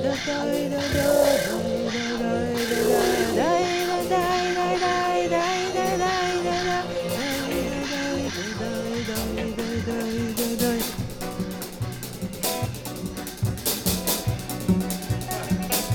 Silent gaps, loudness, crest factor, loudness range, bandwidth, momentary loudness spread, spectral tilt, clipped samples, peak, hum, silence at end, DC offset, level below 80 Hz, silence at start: none; -25 LUFS; 16 dB; 5 LU; over 20 kHz; 9 LU; -4.5 dB/octave; under 0.1%; -8 dBFS; none; 0 s; under 0.1%; -44 dBFS; 0 s